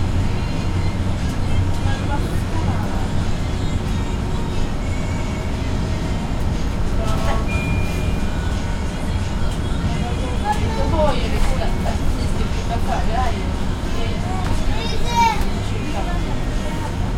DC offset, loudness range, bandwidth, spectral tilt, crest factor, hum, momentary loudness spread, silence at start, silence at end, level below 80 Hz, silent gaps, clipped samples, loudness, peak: under 0.1%; 2 LU; 14.5 kHz; -6 dB/octave; 16 dB; none; 4 LU; 0 s; 0 s; -22 dBFS; none; under 0.1%; -22 LUFS; -4 dBFS